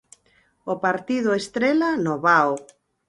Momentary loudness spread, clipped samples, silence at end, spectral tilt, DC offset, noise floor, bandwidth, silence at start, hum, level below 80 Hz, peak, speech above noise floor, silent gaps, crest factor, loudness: 12 LU; under 0.1%; 0.45 s; -5.5 dB/octave; under 0.1%; -62 dBFS; 11.5 kHz; 0.65 s; none; -64 dBFS; -2 dBFS; 41 dB; none; 20 dB; -21 LUFS